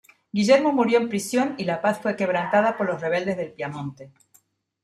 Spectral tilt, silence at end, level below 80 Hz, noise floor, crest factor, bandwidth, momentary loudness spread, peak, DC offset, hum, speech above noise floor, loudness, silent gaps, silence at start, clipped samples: -5.5 dB/octave; 0.75 s; -68 dBFS; -62 dBFS; 18 dB; 13 kHz; 13 LU; -6 dBFS; under 0.1%; none; 39 dB; -23 LUFS; none; 0.35 s; under 0.1%